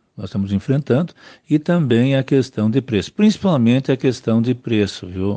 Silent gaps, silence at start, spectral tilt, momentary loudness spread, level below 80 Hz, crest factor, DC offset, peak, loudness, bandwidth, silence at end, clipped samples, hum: none; 0.2 s; -7.5 dB/octave; 7 LU; -58 dBFS; 14 dB; under 0.1%; -4 dBFS; -18 LUFS; 9 kHz; 0 s; under 0.1%; none